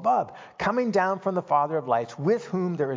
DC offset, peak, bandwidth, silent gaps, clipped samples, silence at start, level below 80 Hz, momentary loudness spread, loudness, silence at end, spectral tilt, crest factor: under 0.1%; -10 dBFS; 7.6 kHz; none; under 0.1%; 0 s; -64 dBFS; 5 LU; -26 LUFS; 0 s; -7 dB/octave; 16 dB